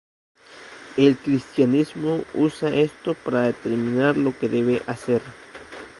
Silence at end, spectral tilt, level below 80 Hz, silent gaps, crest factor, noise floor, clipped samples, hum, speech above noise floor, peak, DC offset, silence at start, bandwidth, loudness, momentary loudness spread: 0.1 s; -7 dB/octave; -60 dBFS; none; 20 dB; -43 dBFS; under 0.1%; none; 22 dB; -4 dBFS; under 0.1%; 0.55 s; 11.5 kHz; -22 LUFS; 19 LU